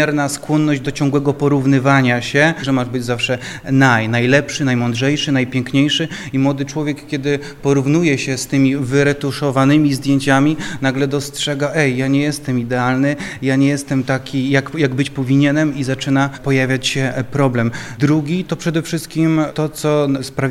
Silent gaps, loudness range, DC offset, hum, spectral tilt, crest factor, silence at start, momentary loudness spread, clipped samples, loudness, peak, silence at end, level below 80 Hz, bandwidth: none; 3 LU; under 0.1%; none; -5.5 dB/octave; 16 dB; 0 s; 6 LU; under 0.1%; -16 LUFS; 0 dBFS; 0 s; -46 dBFS; 14.5 kHz